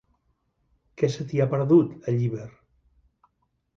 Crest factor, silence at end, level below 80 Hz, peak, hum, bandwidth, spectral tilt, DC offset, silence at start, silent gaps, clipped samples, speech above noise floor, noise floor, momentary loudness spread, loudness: 20 dB; 1.3 s; -62 dBFS; -8 dBFS; none; 7.4 kHz; -8.5 dB/octave; under 0.1%; 1 s; none; under 0.1%; 49 dB; -72 dBFS; 12 LU; -24 LUFS